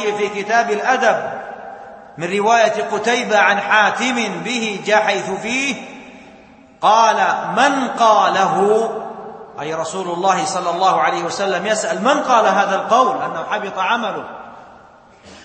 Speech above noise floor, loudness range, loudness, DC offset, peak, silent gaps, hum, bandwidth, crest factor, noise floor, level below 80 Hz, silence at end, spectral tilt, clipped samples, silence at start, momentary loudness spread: 29 dB; 3 LU; -16 LUFS; under 0.1%; 0 dBFS; none; none; 8.8 kHz; 18 dB; -45 dBFS; -62 dBFS; 0 s; -3 dB/octave; under 0.1%; 0 s; 15 LU